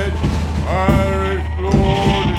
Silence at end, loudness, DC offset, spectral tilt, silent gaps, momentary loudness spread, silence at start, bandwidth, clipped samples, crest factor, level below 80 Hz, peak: 0 s; -17 LUFS; under 0.1%; -7 dB/octave; none; 5 LU; 0 s; 13 kHz; under 0.1%; 14 dB; -22 dBFS; -2 dBFS